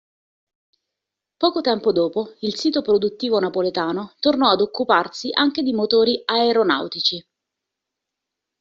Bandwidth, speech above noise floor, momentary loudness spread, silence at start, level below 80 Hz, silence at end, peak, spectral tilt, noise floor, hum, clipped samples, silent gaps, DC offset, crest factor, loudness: 7.6 kHz; 64 dB; 6 LU; 1.4 s; -64 dBFS; 1.4 s; -2 dBFS; -2 dB/octave; -84 dBFS; none; under 0.1%; none; under 0.1%; 18 dB; -20 LUFS